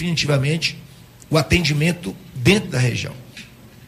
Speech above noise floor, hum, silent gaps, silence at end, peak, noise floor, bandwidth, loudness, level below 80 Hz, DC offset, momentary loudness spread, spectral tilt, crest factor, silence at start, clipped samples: 22 dB; none; none; 0 s; -2 dBFS; -41 dBFS; 15.5 kHz; -19 LUFS; -40 dBFS; under 0.1%; 20 LU; -5 dB/octave; 18 dB; 0 s; under 0.1%